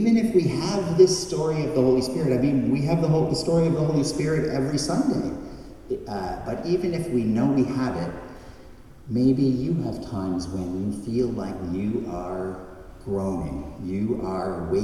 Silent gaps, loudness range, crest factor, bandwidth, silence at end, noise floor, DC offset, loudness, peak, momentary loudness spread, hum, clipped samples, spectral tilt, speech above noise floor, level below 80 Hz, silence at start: none; 7 LU; 20 dB; 13 kHz; 0 s; -45 dBFS; under 0.1%; -24 LUFS; -4 dBFS; 12 LU; none; under 0.1%; -6.5 dB/octave; 21 dB; -46 dBFS; 0 s